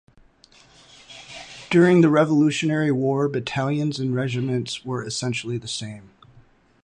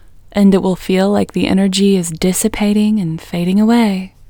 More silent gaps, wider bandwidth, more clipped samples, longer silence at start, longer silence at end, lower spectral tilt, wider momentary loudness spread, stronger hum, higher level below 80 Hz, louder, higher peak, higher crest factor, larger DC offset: neither; second, 11 kHz vs over 20 kHz; neither; first, 1.1 s vs 0.35 s; first, 0.8 s vs 0.2 s; about the same, -6 dB/octave vs -5.5 dB/octave; first, 22 LU vs 6 LU; neither; second, -60 dBFS vs -40 dBFS; second, -21 LUFS vs -14 LUFS; second, -4 dBFS vs 0 dBFS; about the same, 18 dB vs 14 dB; neither